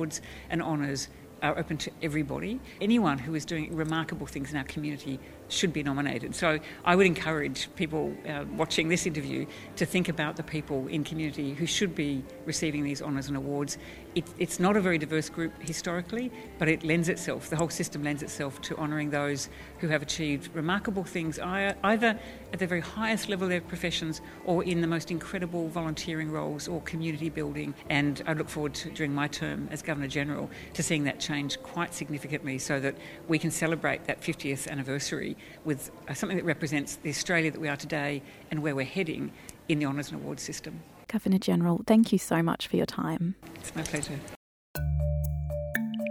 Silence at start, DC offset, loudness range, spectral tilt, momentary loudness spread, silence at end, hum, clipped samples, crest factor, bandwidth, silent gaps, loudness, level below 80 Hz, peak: 0 s; under 0.1%; 4 LU; -5 dB/octave; 10 LU; 0 s; none; under 0.1%; 24 dB; 17 kHz; 44.36-44.74 s; -30 LUFS; -50 dBFS; -6 dBFS